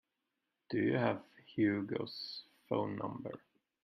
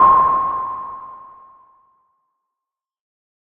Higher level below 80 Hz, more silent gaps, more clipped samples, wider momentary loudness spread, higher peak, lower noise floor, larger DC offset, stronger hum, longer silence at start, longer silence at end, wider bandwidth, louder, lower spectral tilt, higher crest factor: second, -78 dBFS vs -52 dBFS; neither; neither; second, 13 LU vs 25 LU; second, -18 dBFS vs -2 dBFS; about the same, -87 dBFS vs -86 dBFS; neither; neither; first, 0.7 s vs 0 s; second, 0.45 s vs 2.15 s; first, 6 kHz vs 3.6 kHz; second, -37 LUFS vs -17 LUFS; about the same, -8.5 dB/octave vs -8.5 dB/octave; about the same, 20 dB vs 18 dB